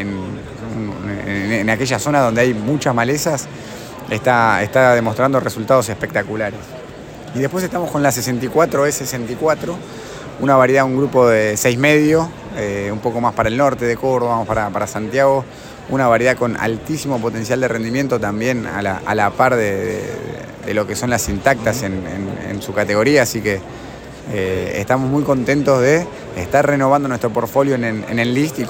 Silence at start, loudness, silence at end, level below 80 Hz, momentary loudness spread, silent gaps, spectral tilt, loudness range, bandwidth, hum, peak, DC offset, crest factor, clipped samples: 0 s; -17 LUFS; 0 s; -44 dBFS; 13 LU; none; -5 dB/octave; 4 LU; 17 kHz; none; 0 dBFS; under 0.1%; 16 dB; under 0.1%